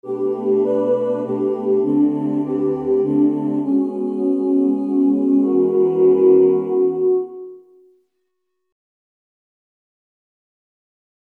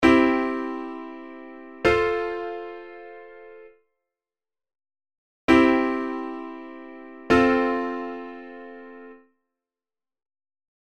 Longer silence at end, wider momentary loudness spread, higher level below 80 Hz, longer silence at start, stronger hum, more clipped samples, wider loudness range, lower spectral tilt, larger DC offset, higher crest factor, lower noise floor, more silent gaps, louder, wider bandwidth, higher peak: first, 3.65 s vs 1.8 s; second, 7 LU vs 24 LU; second, -62 dBFS vs -50 dBFS; about the same, 0.05 s vs 0 s; neither; neither; second, 6 LU vs 11 LU; first, -11 dB/octave vs -6 dB/octave; second, under 0.1% vs 0.2%; second, 14 dB vs 22 dB; second, -75 dBFS vs under -90 dBFS; second, none vs 5.18-5.48 s; first, -17 LUFS vs -23 LUFS; second, 3.1 kHz vs 9.2 kHz; about the same, -4 dBFS vs -4 dBFS